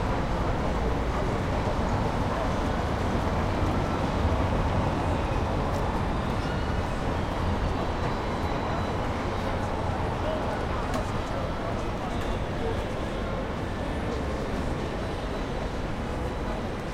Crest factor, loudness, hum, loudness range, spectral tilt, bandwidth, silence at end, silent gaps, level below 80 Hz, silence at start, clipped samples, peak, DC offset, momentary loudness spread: 16 dB; -29 LUFS; none; 4 LU; -6.5 dB/octave; 15 kHz; 0 s; none; -34 dBFS; 0 s; under 0.1%; -12 dBFS; under 0.1%; 5 LU